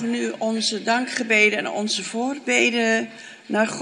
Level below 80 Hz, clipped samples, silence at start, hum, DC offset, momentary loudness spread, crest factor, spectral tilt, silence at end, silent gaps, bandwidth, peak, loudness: -74 dBFS; under 0.1%; 0 s; none; under 0.1%; 10 LU; 18 dB; -2.5 dB/octave; 0 s; none; 11 kHz; -4 dBFS; -21 LUFS